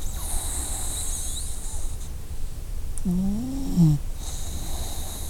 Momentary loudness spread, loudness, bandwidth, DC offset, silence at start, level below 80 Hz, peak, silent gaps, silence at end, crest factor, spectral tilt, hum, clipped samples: 16 LU; -28 LUFS; 17.5 kHz; under 0.1%; 0 s; -30 dBFS; -8 dBFS; none; 0 s; 18 dB; -5 dB/octave; none; under 0.1%